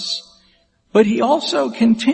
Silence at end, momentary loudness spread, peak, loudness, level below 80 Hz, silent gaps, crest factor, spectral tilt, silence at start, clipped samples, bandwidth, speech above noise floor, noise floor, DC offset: 0 s; 8 LU; 0 dBFS; -17 LUFS; -62 dBFS; none; 16 dB; -5 dB/octave; 0 s; under 0.1%; 8.8 kHz; 43 dB; -58 dBFS; under 0.1%